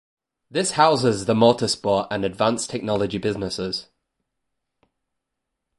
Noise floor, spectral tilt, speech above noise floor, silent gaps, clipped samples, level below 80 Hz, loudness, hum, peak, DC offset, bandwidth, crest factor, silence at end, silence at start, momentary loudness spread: -81 dBFS; -4.5 dB/octave; 60 dB; none; under 0.1%; -54 dBFS; -21 LUFS; none; -2 dBFS; under 0.1%; 11.5 kHz; 22 dB; 1.95 s; 0.5 s; 10 LU